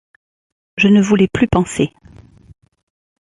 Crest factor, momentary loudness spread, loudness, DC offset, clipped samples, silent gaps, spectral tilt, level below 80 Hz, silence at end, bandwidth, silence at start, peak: 16 dB; 10 LU; -14 LUFS; under 0.1%; under 0.1%; none; -6 dB/octave; -38 dBFS; 1.4 s; 11.5 kHz; 0.75 s; -2 dBFS